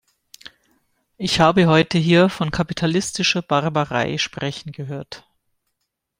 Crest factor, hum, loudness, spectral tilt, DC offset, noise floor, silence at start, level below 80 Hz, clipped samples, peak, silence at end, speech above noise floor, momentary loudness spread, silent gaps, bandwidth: 20 dB; none; -19 LUFS; -5 dB/octave; under 0.1%; -77 dBFS; 1.2 s; -50 dBFS; under 0.1%; -2 dBFS; 1 s; 58 dB; 16 LU; none; 15 kHz